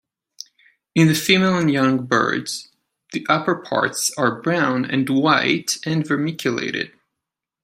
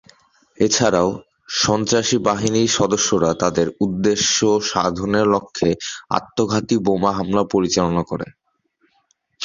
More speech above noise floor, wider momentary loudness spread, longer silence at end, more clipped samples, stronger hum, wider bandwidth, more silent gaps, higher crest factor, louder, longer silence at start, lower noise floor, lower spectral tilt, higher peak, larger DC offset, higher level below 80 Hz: first, 64 dB vs 46 dB; first, 14 LU vs 7 LU; first, 0.75 s vs 0 s; neither; neither; first, 16 kHz vs 7.6 kHz; neither; about the same, 18 dB vs 18 dB; about the same, -19 LUFS vs -18 LUFS; first, 0.95 s vs 0.6 s; first, -83 dBFS vs -65 dBFS; about the same, -4.5 dB/octave vs -4 dB/octave; about the same, -2 dBFS vs -2 dBFS; neither; second, -62 dBFS vs -48 dBFS